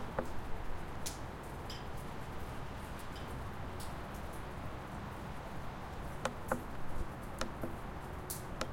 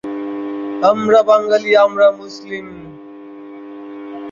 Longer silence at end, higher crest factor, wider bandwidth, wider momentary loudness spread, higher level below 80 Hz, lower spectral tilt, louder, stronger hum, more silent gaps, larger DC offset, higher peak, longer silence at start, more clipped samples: about the same, 0 s vs 0 s; first, 24 dB vs 16 dB; first, 16.5 kHz vs 7.4 kHz; second, 4 LU vs 24 LU; first, -48 dBFS vs -62 dBFS; about the same, -5 dB/octave vs -5 dB/octave; second, -44 LUFS vs -14 LUFS; neither; neither; neither; second, -18 dBFS vs -2 dBFS; about the same, 0 s vs 0.05 s; neither